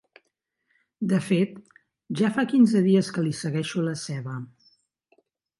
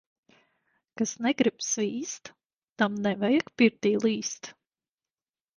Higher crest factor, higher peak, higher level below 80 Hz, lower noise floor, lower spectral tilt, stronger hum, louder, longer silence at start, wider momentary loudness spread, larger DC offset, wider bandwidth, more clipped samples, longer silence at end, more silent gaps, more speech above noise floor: about the same, 18 dB vs 20 dB; about the same, -8 dBFS vs -8 dBFS; about the same, -72 dBFS vs -70 dBFS; second, -77 dBFS vs under -90 dBFS; first, -6.5 dB/octave vs -4 dB/octave; neither; first, -24 LUFS vs -27 LUFS; about the same, 1 s vs 0.95 s; about the same, 15 LU vs 13 LU; neither; about the same, 11.5 kHz vs 10.5 kHz; neither; about the same, 1.15 s vs 1.05 s; second, none vs 2.46-2.76 s; second, 54 dB vs over 63 dB